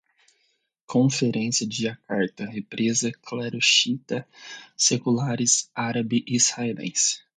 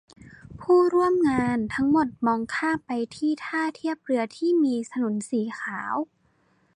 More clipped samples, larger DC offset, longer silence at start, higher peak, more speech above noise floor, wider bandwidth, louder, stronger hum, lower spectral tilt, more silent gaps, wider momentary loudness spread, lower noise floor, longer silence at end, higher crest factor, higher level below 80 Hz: neither; neither; first, 0.9 s vs 0.2 s; first, -6 dBFS vs -10 dBFS; first, 46 dB vs 41 dB; about the same, 9.6 kHz vs 10.5 kHz; about the same, -23 LUFS vs -25 LUFS; neither; second, -3 dB/octave vs -6 dB/octave; neither; about the same, 12 LU vs 10 LU; first, -71 dBFS vs -65 dBFS; second, 0.2 s vs 0.7 s; first, 20 dB vs 14 dB; second, -68 dBFS vs -58 dBFS